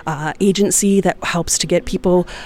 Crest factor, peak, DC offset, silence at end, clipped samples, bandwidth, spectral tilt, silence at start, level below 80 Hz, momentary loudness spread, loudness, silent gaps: 14 dB; -2 dBFS; under 0.1%; 0 s; under 0.1%; 17 kHz; -4 dB/octave; 0.05 s; -36 dBFS; 5 LU; -16 LUFS; none